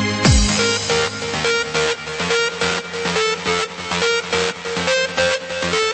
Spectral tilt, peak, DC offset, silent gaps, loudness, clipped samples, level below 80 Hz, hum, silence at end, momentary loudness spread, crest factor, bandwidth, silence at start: -3 dB/octave; 0 dBFS; under 0.1%; none; -18 LUFS; under 0.1%; -30 dBFS; none; 0 s; 6 LU; 18 dB; 8.8 kHz; 0 s